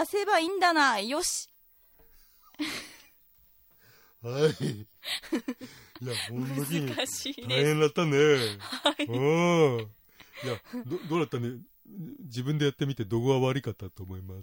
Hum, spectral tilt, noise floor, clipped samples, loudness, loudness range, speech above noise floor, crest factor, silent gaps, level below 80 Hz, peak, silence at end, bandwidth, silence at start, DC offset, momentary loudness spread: none; -4.5 dB/octave; -62 dBFS; under 0.1%; -28 LUFS; 9 LU; 33 dB; 18 dB; none; -66 dBFS; -12 dBFS; 0 s; 16.5 kHz; 0 s; under 0.1%; 18 LU